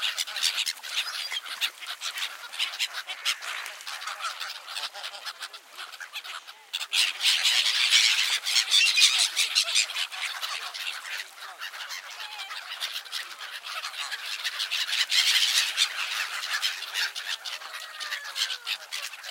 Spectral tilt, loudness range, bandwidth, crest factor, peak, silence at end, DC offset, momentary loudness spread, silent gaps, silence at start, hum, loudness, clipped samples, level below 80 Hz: 6.5 dB/octave; 13 LU; 17 kHz; 24 dB; -4 dBFS; 0 s; under 0.1%; 17 LU; none; 0 s; none; -26 LUFS; under 0.1%; under -90 dBFS